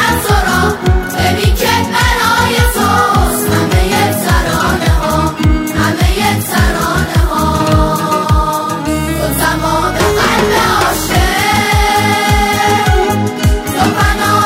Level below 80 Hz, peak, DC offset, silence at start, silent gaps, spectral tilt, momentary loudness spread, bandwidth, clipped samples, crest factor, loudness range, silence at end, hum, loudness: -18 dBFS; 0 dBFS; under 0.1%; 0 s; none; -4.5 dB/octave; 3 LU; 16.5 kHz; under 0.1%; 12 dB; 2 LU; 0 s; none; -12 LUFS